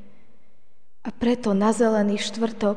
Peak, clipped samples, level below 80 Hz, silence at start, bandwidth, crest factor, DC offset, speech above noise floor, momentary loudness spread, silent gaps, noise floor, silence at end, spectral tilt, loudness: -8 dBFS; under 0.1%; -56 dBFS; 1.05 s; 10 kHz; 16 dB; 2%; 45 dB; 11 LU; none; -66 dBFS; 0 s; -5.5 dB/octave; -22 LUFS